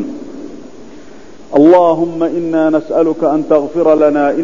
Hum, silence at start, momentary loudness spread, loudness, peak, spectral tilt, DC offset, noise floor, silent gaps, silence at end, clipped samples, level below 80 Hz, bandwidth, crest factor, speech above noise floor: none; 0 s; 19 LU; -11 LUFS; 0 dBFS; -8 dB/octave; 2%; -37 dBFS; none; 0 s; 0.2%; -50 dBFS; 7.4 kHz; 12 dB; 26 dB